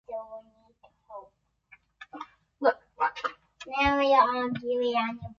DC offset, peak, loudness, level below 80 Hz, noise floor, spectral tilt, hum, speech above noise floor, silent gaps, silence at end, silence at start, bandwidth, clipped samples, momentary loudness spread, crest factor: under 0.1%; -8 dBFS; -27 LUFS; -54 dBFS; -62 dBFS; -5.5 dB/octave; none; 37 dB; none; 0.05 s; 0.1 s; 7.4 kHz; under 0.1%; 25 LU; 20 dB